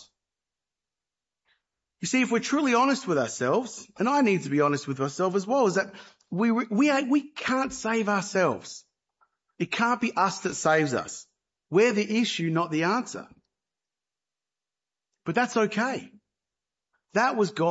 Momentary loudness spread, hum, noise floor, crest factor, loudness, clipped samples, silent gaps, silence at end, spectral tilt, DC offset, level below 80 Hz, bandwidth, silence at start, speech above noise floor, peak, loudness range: 12 LU; none; under -90 dBFS; 18 dB; -26 LUFS; under 0.1%; none; 0 s; -4.5 dB/octave; under 0.1%; -70 dBFS; 8 kHz; 2.05 s; over 65 dB; -10 dBFS; 6 LU